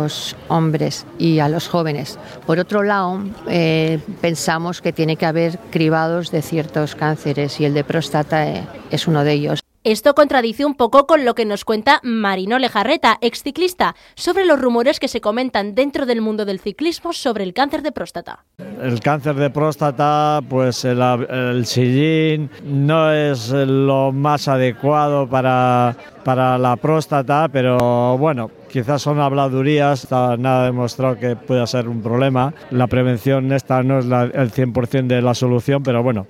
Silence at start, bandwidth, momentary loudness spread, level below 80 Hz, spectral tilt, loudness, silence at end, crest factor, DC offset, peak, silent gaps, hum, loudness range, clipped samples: 0 s; 15.5 kHz; 7 LU; -52 dBFS; -6 dB/octave; -17 LUFS; 0.05 s; 16 dB; under 0.1%; 0 dBFS; none; none; 3 LU; under 0.1%